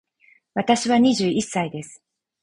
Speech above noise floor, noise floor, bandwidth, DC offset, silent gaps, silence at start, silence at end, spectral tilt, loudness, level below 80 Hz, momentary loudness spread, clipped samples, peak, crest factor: 38 dB; -59 dBFS; 11 kHz; under 0.1%; none; 0.55 s; 0.5 s; -4.5 dB/octave; -21 LUFS; -60 dBFS; 15 LU; under 0.1%; -4 dBFS; 18 dB